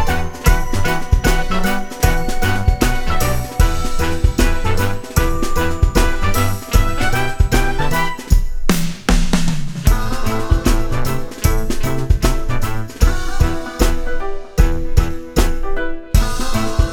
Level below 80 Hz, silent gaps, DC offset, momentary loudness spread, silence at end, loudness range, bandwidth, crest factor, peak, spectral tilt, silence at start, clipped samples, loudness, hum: -16 dBFS; none; 0.6%; 5 LU; 0 s; 2 LU; 19.5 kHz; 14 dB; 0 dBFS; -5 dB/octave; 0 s; under 0.1%; -19 LUFS; none